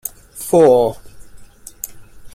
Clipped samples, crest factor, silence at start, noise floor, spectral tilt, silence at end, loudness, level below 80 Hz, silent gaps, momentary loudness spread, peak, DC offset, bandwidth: under 0.1%; 16 dB; 0.35 s; -38 dBFS; -5.5 dB/octave; 0.05 s; -13 LUFS; -46 dBFS; none; 20 LU; -2 dBFS; under 0.1%; 16 kHz